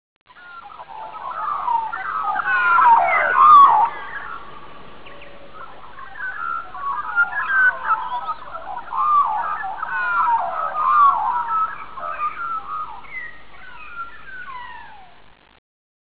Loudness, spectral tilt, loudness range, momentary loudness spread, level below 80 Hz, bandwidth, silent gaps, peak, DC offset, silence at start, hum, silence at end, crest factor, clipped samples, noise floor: -18 LUFS; -5.5 dB/octave; 15 LU; 23 LU; -56 dBFS; 4 kHz; none; -2 dBFS; 2%; 0.25 s; none; 0.55 s; 18 dB; under 0.1%; -45 dBFS